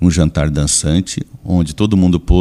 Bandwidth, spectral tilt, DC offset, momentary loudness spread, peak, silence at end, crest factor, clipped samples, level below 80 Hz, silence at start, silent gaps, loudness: 13 kHz; -5.5 dB/octave; under 0.1%; 6 LU; 0 dBFS; 0 s; 12 dB; under 0.1%; -22 dBFS; 0 s; none; -15 LUFS